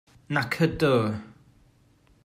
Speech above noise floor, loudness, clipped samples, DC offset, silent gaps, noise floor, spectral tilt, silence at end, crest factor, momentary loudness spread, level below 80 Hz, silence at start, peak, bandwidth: 36 dB; -25 LUFS; under 0.1%; under 0.1%; none; -61 dBFS; -6.5 dB/octave; 0.95 s; 20 dB; 8 LU; -54 dBFS; 0.3 s; -8 dBFS; 16 kHz